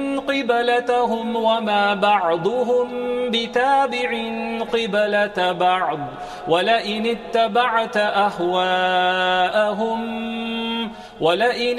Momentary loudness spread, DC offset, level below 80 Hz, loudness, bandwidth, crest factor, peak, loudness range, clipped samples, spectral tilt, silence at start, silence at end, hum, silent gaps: 7 LU; under 0.1%; -56 dBFS; -20 LUFS; 13 kHz; 16 dB; -4 dBFS; 1 LU; under 0.1%; -4.5 dB/octave; 0 s; 0 s; none; none